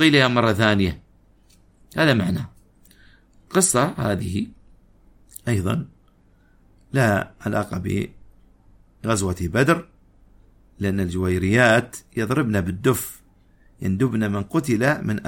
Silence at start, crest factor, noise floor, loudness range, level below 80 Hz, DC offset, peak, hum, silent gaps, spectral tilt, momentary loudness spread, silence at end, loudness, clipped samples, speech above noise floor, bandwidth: 0 s; 22 dB; -56 dBFS; 5 LU; -48 dBFS; under 0.1%; -2 dBFS; none; none; -5 dB/octave; 13 LU; 0 s; -21 LUFS; under 0.1%; 36 dB; 16.5 kHz